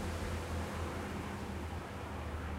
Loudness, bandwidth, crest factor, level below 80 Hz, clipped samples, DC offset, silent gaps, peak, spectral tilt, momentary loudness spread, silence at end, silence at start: -41 LUFS; 16 kHz; 12 dB; -46 dBFS; under 0.1%; under 0.1%; none; -28 dBFS; -5.5 dB/octave; 3 LU; 0 s; 0 s